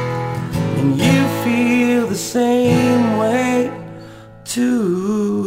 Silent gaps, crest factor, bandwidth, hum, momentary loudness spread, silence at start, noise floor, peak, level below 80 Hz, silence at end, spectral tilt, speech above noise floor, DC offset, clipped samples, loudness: none; 14 dB; 16 kHz; none; 10 LU; 0 s; -37 dBFS; -2 dBFS; -46 dBFS; 0 s; -6 dB/octave; 22 dB; under 0.1%; under 0.1%; -17 LUFS